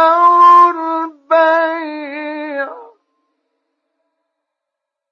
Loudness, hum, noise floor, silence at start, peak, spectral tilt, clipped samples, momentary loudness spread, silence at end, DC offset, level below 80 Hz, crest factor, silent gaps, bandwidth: -11 LUFS; none; -80 dBFS; 0 s; 0 dBFS; -2.5 dB/octave; under 0.1%; 18 LU; 2.3 s; under 0.1%; -88 dBFS; 14 dB; none; 6.8 kHz